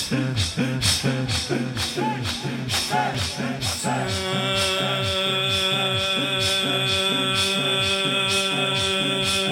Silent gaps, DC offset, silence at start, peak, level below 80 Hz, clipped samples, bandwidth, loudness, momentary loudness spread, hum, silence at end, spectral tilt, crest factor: none; under 0.1%; 0 s; -6 dBFS; -50 dBFS; under 0.1%; 16.5 kHz; -21 LUFS; 5 LU; none; 0 s; -3 dB/octave; 16 dB